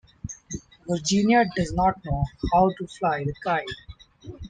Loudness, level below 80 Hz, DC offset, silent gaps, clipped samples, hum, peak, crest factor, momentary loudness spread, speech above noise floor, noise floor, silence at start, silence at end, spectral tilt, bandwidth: -24 LUFS; -42 dBFS; under 0.1%; none; under 0.1%; none; -8 dBFS; 18 dB; 19 LU; 21 dB; -44 dBFS; 0.25 s; 0 s; -5 dB/octave; 9.4 kHz